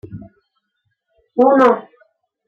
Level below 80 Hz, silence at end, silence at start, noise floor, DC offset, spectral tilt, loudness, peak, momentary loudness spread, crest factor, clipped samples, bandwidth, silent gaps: -60 dBFS; 0.65 s; 0.05 s; -72 dBFS; under 0.1%; -7.5 dB/octave; -14 LUFS; -2 dBFS; 25 LU; 18 dB; under 0.1%; 7.4 kHz; none